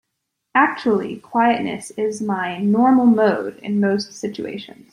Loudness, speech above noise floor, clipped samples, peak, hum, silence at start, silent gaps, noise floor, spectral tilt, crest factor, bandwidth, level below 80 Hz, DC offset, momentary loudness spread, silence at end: -19 LUFS; 58 dB; under 0.1%; -2 dBFS; none; 0.55 s; none; -77 dBFS; -6 dB/octave; 18 dB; 11.5 kHz; -64 dBFS; under 0.1%; 13 LU; 0.25 s